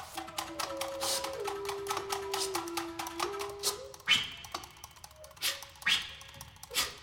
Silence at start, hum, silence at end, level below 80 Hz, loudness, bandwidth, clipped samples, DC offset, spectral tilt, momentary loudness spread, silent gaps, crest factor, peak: 0 s; none; 0 s; -62 dBFS; -34 LUFS; 17 kHz; under 0.1%; under 0.1%; -1 dB/octave; 19 LU; none; 26 dB; -12 dBFS